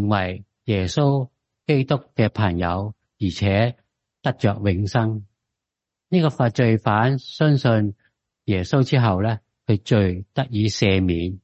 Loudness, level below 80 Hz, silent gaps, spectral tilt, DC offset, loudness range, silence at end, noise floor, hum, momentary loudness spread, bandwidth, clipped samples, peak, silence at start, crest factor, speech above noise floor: -21 LUFS; -40 dBFS; none; -7 dB/octave; under 0.1%; 3 LU; 0.05 s; -85 dBFS; none; 9 LU; 8.2 kHz; under 0.1%; -4 dBFS; 0 s; 16 dB; 66 dB